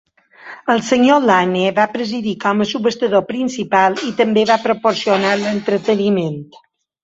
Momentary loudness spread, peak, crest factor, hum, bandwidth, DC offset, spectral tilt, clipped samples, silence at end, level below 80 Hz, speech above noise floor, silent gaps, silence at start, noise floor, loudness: 9 LU; -2 dBFS; 16 dB; none; 8 kHz; under 0.1%; -5 dB/octave; under 0.1%; 0.6 s; -60 dBFS; 23 dB; none; 0.45 s; -39 dBFS; -16 LUFS